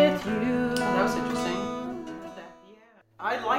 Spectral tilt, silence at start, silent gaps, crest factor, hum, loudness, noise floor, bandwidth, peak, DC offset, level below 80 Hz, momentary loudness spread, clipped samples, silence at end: -5 dB/octave; 0 s; none; 18 dB; none; -28 LUFS; -56 dBFS; 16 kHz; -10 dBFS; under 0.1%; -56 dBFS; 16 LU; under 0.1%; 0 s